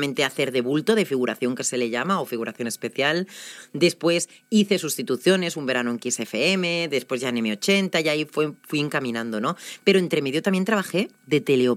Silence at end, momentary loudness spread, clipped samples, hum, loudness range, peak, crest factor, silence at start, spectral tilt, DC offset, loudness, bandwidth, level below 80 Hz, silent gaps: 0 s; 7 LU; under 0.1%; none; 2 LU; -4 dBFS; 18 dB; 0 s; -4 dB/octave; under 0.1%; -23 LUFS; 16 kHz; -80 dBFS; none